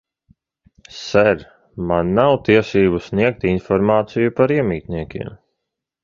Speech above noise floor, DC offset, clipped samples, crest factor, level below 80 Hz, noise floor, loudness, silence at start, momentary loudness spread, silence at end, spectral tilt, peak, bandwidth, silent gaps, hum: 62 dB; under 0.1%; under 0.1%; 18 dB; -42 dBFS; -79 dBFS; -17 LUFS; 0.95 s; 15 LU; 0.7 s; -7 dB/octave; 0 dBFS; 7.4 kHz; none; none